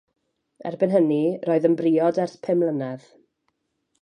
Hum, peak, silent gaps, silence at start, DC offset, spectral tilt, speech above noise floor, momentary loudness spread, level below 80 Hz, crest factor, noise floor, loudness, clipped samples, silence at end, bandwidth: none; -6 dBFS; none; 0.65 s; under 0.1%; -8.5 dB/octave; 53 dB; 14 LU; -76 dBFS; 16 dB; -74 dBFS; -22 LUFS; under 0.1%; 1.05 s; 9.6 kHz